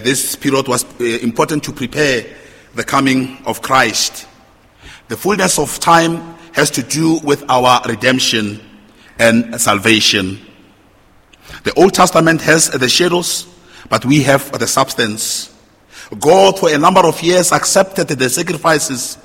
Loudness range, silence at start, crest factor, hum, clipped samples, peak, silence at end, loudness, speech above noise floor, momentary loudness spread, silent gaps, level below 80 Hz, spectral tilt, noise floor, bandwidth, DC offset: 4 LU; 0 s; 14 dB; none; 0.3%; 0 dBFS; 0.1 s; -13 LUFS; 35 dB; 11 LU; none; -46 dBFS; -3.5 dB/octave; -48 dBFS; 17 kHz; under 0.1%